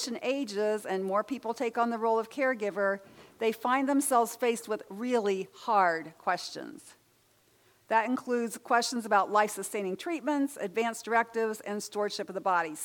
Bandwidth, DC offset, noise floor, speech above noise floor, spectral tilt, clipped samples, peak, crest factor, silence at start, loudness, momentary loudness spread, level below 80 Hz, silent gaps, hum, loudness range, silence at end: 19 kHz; under 0.1%; -67 dBFS; 37 dB; -3.5 dB/octave; under 0.1%; -12 dBFS; 20 dB; 0 s; -30 LUFS; 8 LU; -82 dBFS; none; none; 3 LU; 0 s